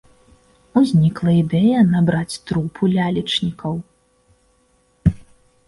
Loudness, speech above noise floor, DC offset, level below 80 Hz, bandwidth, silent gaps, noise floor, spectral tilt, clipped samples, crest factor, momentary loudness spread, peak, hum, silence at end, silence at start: -18 LUFS; 43 dB; under 0.1%; -40 dBFS; 11.5 kHz; none; -60 dBFS; -7 dB/octave; under 0.1%; 16 dB; 10 LU; -2 dBFS; none; 0.45 s; 0.75 s